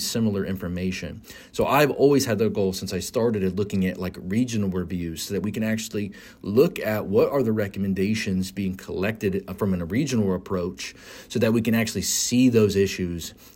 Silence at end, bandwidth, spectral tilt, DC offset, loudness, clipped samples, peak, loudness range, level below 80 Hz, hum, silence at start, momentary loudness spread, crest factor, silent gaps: 0.05 s; 16.5 kHz; -5 dB/octave; under 0.1%; -24 LUFS; under 0.1%; -6 dBFS; 3 LU; -52 dBFS; none; 0 s; 12 LU; 18 dB; none